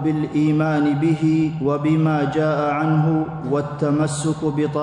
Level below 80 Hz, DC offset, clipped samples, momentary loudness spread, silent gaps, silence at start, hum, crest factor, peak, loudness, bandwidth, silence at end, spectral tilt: -52 dBFS; under 0.1%; under 0.1%; 4 LU; none; 0 s; none; 12 dB; -8 dBFS; -20 LUFS; 10.5 kHz; 0 s; -7.5 dB/octave